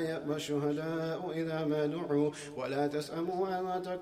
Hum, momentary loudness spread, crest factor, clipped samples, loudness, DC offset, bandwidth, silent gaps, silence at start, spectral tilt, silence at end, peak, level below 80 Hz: none; 4 LU; 14 dB; under 0.1%; -34 LUFS; under 0.1%; 15.5 kHz; none; 0 s; -6 dB/octave; 0 s; -20 dBFS; -70 dBFS